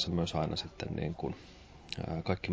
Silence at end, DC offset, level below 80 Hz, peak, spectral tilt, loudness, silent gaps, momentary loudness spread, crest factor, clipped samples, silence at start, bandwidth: 0 s; under 0.1%; -50 dBFS; -18 dBFS; -6 dB/octave; -37 LUFS; none; 15 LU; 18 dB; under 0.1%; 0 s; 8 kHz